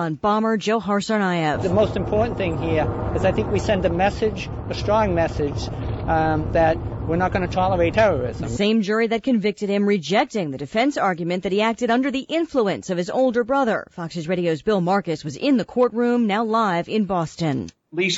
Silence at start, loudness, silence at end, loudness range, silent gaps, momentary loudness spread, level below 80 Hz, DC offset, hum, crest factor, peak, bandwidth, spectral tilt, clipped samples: 0 s; -21 LUFS; 0 s; 2 LU; none; 6 LU; -38 dBFS; under 0.1%; none; 14 dB; -8 dBFS; 8 kHz; -6 dB/octave; under 0.1%